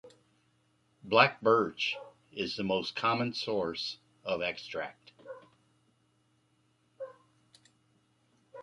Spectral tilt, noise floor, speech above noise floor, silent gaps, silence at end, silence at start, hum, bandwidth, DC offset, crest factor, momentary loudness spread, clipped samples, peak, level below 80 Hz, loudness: -5 dB/octave; -72 dBFS; 41 dB; none; 0 s; 0.05 s; none; 11 kHz; under 0.1%; 28 dB; 23 LU; under 0.1%; -6 dBFS; -72 dBFS; -31 LUFS